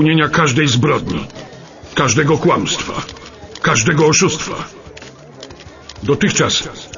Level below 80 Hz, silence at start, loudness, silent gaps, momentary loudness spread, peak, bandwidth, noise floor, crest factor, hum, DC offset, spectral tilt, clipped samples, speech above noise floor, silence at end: -42 dBFS; 0 s; -15 LUFS; none; 23 LU; 0 dBFS; 7.4 kHz; -36 dBFS; 16 dB; none; under 0.1%; -4 dB/octave; under 0.1%; 22 dB; 0 s